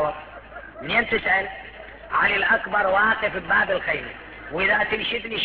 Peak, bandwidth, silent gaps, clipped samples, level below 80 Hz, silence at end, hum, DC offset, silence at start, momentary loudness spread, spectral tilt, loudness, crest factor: -6 dBFS; 5.6 kHz; none; under 0.1%; -48 dBFS; 0 s; none; under 0.1%; 0 s; 19 LU; -6.5 dB/octave; -21 LUFS; 16 dB